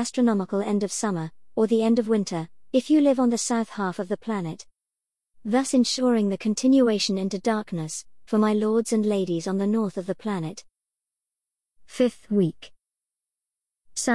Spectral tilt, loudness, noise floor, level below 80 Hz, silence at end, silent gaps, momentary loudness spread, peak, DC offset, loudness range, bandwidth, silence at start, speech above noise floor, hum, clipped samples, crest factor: -5 dB/octave; -24 LUFS; -88 dBFS; -66 dBFS; 0 s; none; 12 LU; -8 dBFS; 0.3%; 6 LU; 12 kHz; 0 s; 65 dB; none; under 0.1%; 16 dB